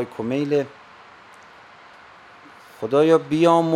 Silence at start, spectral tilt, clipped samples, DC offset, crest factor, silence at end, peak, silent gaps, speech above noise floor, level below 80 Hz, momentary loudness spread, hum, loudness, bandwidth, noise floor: 0 s; -7 dB/octave; under 0.1%; under 0.1%; 18 dB; 0 s; -4 dBFS; none; 28 dB; -64 dBFS; 13 LU; none; -20 LUFS; 11.5 kHz; -46 dBFS